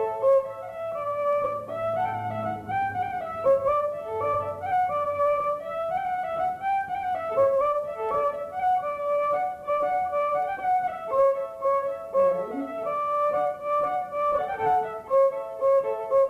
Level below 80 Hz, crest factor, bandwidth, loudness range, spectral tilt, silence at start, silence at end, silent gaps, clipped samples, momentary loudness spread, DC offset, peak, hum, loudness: -60 dBFS; 12 dB; 13 kHz; 2 LU; -6.5 dB/octave; 0 s; 0 s; none; under 0.1%; 7 LU; under 0.1%; -12 dBFS; none; -26 LUFS